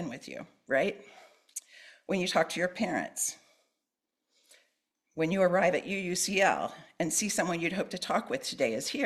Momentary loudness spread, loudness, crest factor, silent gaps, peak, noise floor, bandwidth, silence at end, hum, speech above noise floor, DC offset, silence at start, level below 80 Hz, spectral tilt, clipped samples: 17 LU; -30 LUFS; 20 dB; none; -12 dBFS; -87 dBFS; 14.5 kHz; 0 s; none; 56 dB; under 0.1%; 0 s; -70 dBFS; -3.5 dB/octave; under 0.1%